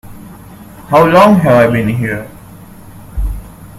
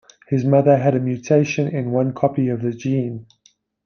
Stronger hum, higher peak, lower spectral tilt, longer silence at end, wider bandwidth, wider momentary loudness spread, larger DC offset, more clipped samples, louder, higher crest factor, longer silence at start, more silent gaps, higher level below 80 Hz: neither; about the same, 0 dBFS vs -2 dBFS; about the same, -7 dB/octave vs -8 dB/octave; second, 0.05 s vs 0.65 s; first, 15.5 kHz vs 6.8 kHz; first, 21 LU vs 8 LU; neither; first, 0.3% vs under 0.1%; first, -10 LUFS vs -19 LUFS; about the same, 12 dB vs 16 dB; second, 0.05 s vs 0.3 s; neither; first, -28 dBFS vs -60 dBFS